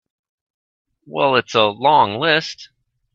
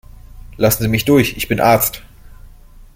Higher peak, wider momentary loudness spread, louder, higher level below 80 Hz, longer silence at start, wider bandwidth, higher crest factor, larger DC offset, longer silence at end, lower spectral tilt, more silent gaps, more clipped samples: about the same, 0 dBFS vs -2 dBFS; first, 15 LU vs 6 LU; about the same, -16 LUFS vs -15 LUFS; second, -60 dBFS vs -36 dBFS; first, 1.1 s vs 0.25 s; second, 7.8 kHz vs 16.5 kHz; about the same, 18 dB vs 16 dB; neither; about the same, 0.5 s vs 0.5 s; about the same, -4.5 dB/octave vs -5 dB/octave; neither; neither